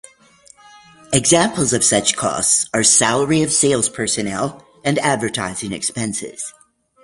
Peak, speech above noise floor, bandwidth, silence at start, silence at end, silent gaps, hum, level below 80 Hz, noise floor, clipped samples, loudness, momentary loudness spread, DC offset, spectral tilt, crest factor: 0 dBFS; 32 dB; 12 kHz; 1.1 s; 0.55 s; none; none; -52 dBFS; -49 dBFS; under 0.1%; -16 LUFS; 12 LU; under 0.1%; -3 dB/octave; 18 dB